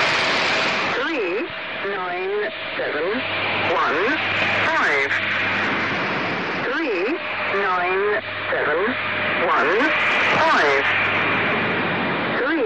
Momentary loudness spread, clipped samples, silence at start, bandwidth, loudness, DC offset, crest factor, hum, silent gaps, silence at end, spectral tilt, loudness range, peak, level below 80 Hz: 7 LU; under 0.1%; 0 s; 9.6 kHz; -20 LUFS; 0.2%; 12 dB; none; none; 0 s; -4 dB/octave; 4 LU; -8 dBFS; -58 dBFS